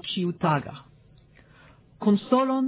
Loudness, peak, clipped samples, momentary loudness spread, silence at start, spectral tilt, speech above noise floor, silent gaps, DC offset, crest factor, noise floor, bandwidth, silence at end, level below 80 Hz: -25 LUFS; -8 dBFS; under 0.1%; 16 LU; 0.05 s; -11 dB/octave; 31 dB; none; under 0.1%; 18 dB; -55 dBFS; 4 kHz; 0 s; -62 dBFS